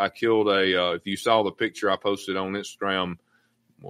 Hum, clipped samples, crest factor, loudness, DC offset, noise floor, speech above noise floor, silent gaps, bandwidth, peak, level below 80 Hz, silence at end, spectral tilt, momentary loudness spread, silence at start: none; under 0.1%; 20 dB; -24 LUFS; under 0.1%; -66 dBFS; 42 dB; none; 16 kHz; -6 dBFS; -66 dBFS; 0 s; -4.5 dB/octave; 8 LU; 0 s